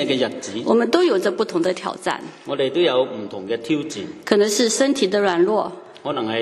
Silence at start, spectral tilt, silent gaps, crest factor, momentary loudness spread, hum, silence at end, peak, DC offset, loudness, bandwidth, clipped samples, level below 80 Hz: 0 s; -3.5 dB/octave; none; 20 dB; 12 LU; none; 0 s; 0 dBFS; under 0.1%; -20 LUFS; 13 kHz; under 0.1%; -66 dBFS